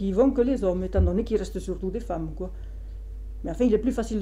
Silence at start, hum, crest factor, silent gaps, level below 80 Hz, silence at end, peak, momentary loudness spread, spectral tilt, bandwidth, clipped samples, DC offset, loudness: 0 s; none; 14 dB; none; -34 dBFS; 0 s; -10 dBFS; 18 LU; -8 dB/octave; 14 kHz; under 0.1%; under 0.1%; -26 LUFS